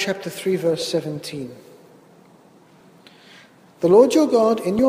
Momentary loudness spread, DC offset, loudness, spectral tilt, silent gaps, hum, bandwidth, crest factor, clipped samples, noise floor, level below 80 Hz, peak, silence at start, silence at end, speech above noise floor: 17 LU; under 0.1%; -19 LUFS; -5.5 dB/octave; none; none; 15.5 kHz; 18 dB; under 0.1%; -51 dBFS; -60 dBFS; -2 dBFS; 0 s; 0 s; 33 dB